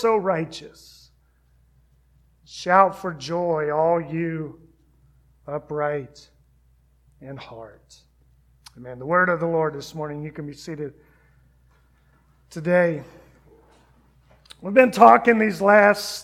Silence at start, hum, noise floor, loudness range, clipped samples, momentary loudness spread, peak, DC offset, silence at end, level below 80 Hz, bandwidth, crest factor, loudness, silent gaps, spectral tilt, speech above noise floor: 0 s; none; -60 dBFS; 14 LU; under 0.1%; 24 LU; 0 dBFS; under 0.1%; 0 s; -58 dBFS; 15.5 kHz; 24 dB; -20 LUFS; none; -6 dB/octave; 39 dB